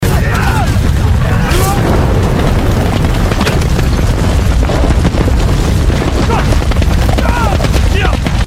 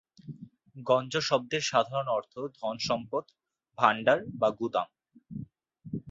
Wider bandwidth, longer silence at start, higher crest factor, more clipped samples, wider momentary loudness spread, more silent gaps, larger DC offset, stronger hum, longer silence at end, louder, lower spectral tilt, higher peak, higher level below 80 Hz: first, 16 kHz vs 7.8 kHz; second, 0 s vs 0.25 s; second, 10 dB vs 24 dB; neither; second, 1 LU vs 20 LU; neither; neither; neither; about the same, 0 s vs 0 s; first, -12 LUFS vs -29 LUFS; first, -6 dB/octave vs -4 dB/octave; first, 0 dBFS vs -6 dBFS; first, -14 dBFS vs -68 dBFS